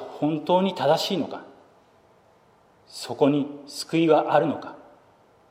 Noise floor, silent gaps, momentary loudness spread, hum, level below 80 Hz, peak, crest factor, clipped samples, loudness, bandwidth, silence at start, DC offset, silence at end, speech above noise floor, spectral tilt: -58 dBFS; none; 17 LU; none; -74 dBFS; -6 dBFS; 20 dB; under 0.1%; -23 LUFS; 16 kHz; 0 s; under 0.1%; 0.7 s; 35 dB; -5.5 dB/octave